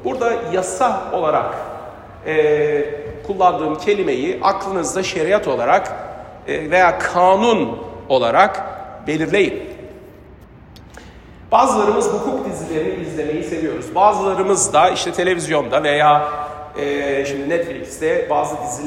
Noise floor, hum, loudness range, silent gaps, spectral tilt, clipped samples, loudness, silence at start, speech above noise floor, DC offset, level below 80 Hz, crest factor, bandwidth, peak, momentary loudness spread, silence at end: -41 dBFS; none; 4 LU; none; -4 dB/octave; under 0.1%; -17 LUFS; 0 s; 24 dB; under 0.1%; -48 dBFS; 18 dB; 15.5 kHz; 0 dBFS; 14 LU; 0 s